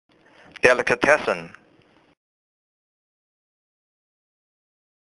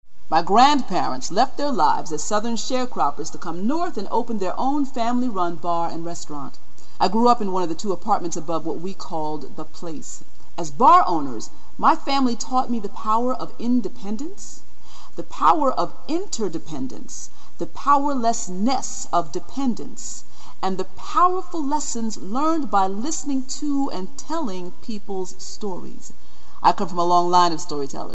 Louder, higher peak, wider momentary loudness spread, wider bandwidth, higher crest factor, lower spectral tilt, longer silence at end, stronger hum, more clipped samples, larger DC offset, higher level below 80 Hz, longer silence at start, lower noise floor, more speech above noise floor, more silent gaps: first, -19 LUFS vs -23 LUFS; about the same, 0 dBFS vs -2 dBFS; second, 9 LU vs 16 LU; first, 11.5 kHz vs 8.4 kHz; first, 26 dB vs 20 dB; about the same, -3.5 dB/octave vs -4.5 dB/octave; first, 3.65 s vs 0 s; neither; neither; second, under 0.1% vs 10%; about the same, -58 dBFS vs -54 dBFS; first, 0.65 s vs 0 s; first, -58 dBFS vs -48 dBFS; first, 38 dB vs 26 dB; neither